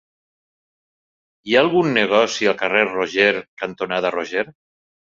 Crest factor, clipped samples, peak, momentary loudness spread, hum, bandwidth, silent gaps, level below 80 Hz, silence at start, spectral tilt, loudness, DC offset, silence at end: 20 dB; under 0.1%; -2 dBFS; 10 LU; none; 7.6 kHz; 3.48-3.57 s; -62 dBFS; 1.45 s; -4 dB/octave; -18 LUFS; under 0.1%; 0.55 s